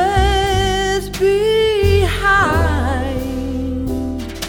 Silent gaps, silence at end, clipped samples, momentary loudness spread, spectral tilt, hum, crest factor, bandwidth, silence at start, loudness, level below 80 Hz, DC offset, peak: none; 0 s; under 0.1%; 9 LU; -5 dB/octave; none; 14 dB; 18.5 kHz; 0 s; -16 LUFS; -24 dBFS; under 0.1%; -2 dBFS